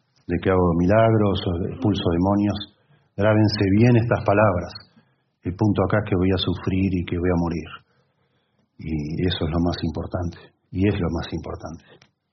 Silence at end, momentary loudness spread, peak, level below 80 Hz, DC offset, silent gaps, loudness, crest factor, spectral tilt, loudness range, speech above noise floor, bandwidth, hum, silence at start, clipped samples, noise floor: 0.55 s; 16 LU; -4 dBFS; -46 dBFS; under 0.1%; none; -22 LUFS; 18 dB; -6.5 dB/octave; 6 LU; 46 dB; 6.2 kHz; none; 0.3 s; under 0.1%; -67 dBFS